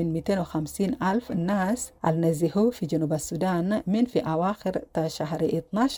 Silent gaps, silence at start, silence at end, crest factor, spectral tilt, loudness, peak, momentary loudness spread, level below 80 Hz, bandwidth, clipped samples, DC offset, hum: none; 0 s; 0 s; 16 dB; -6.5 dB/octave; -26 LUFS; -10 dBFS; 5 LU; -54 dBFS; 19 kHz; under 0.1%; under 0.1%; none